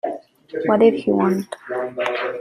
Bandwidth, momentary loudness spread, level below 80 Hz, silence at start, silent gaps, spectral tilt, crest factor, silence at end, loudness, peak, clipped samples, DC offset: 14 kHz; 14 LU; -64 dBFS; 0.05 s; none; -7 dB/octave; 18 dB; 0 s; -20 LUFS; -2 dBFS; under 0.1%; under 0.1%